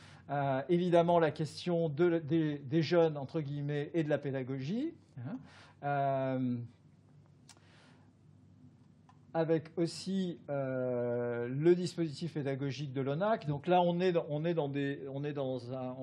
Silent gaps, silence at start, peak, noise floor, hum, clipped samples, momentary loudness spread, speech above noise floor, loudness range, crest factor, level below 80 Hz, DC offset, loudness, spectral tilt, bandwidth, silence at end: none; 0 s; -14 dBFS; -61 dBFS; none; under 0.1%; 10 LU; 28 dB; 8 LU; 20 dB; -82 dBFS; under 0.1%; -34 LUFS; -7.5 dB/octave; 11 kHz; 0 s